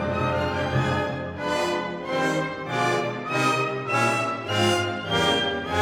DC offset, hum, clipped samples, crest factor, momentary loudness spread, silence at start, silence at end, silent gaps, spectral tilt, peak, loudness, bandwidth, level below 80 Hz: under 0.1%; none; under 0.1%; 16 dB; 6 LU; 0 s; 0 s; none; -4.5 dB/octave; -8 dBFS; -24 LUFS; 17 kHz; -50 dBFS